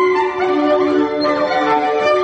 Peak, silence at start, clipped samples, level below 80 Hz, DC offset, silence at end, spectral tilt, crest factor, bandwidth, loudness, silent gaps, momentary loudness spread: -4 dBFS; 0 s; under 0.1%; -56 dBFS; under 0.1%; 0 s; -5 dB/octave; 10 dB; 8.4 kHz; -16 LUFS; none; 2 LU